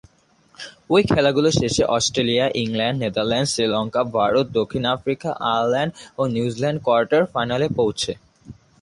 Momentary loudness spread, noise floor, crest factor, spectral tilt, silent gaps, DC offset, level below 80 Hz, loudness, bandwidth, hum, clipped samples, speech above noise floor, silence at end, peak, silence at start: 8 LU; -57 dBFS; 16 dB; -4.5 dB/octave; none; under 0.1%; -48 dBFS; -20 LUFS; 11.5 kHz; none; under 0.1%; 37 dB; 0.3 s; -4 dBFS; 0.6 s